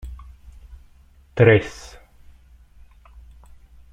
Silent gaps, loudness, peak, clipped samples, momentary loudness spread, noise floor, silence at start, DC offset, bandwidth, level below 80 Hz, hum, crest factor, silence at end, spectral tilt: none; -16 LUFS; -2 dBFS; under 0.1%; 28 LU; -51 dBFS; 0.05 s; under 0.1%; 10 kHz; -44 dBFS; none; 22 dB; 2.2 s; -7 dB/octave